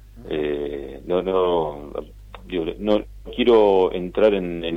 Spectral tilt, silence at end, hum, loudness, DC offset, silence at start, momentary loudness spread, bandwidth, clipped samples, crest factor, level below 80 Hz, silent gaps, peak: -7.5 dB/octave; 0 s; none; -21 LUFS; under 0.1%; 0.15 s; 17 LU; 6 kHz; under 0.1%; 16 dB; -42 dBFS; none; -6 dBFS